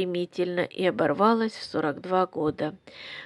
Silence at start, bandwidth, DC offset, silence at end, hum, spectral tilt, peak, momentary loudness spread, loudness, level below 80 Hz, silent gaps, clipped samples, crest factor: 0 s; 11.5 kHz; under 0.1%; 0 s; none; -6.5 dB/octave; -6 dBFS; 11 LU; -26 LUFS; -68 dBFS; none; under 0.1%; 20 dB